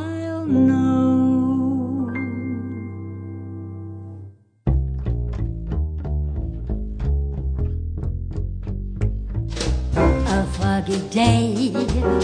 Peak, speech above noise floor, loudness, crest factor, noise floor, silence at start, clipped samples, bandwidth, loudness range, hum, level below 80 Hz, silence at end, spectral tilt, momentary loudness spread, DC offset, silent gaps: -4 dBFS; 23 dB; -22 LUFS; 18 dB; -42 dBFS; 0 s; under 0.1%; 10 kHz; 7 LU; none; -28 dBFS; 0 s; -7 dB/octave; 15 LU; under 0.1%; none